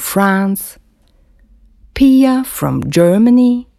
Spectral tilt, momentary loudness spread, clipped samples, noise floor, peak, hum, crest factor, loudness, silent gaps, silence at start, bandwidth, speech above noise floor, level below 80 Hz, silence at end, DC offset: -6 dB/octave; 12 LU; under 0.1%; -51 dBFS; 0 dBFS; none; 14 dB; -12 LUFS; none; 0 s; 15 kHz; 40 dB; -40 dBFS; 0.15 s; under 0.1%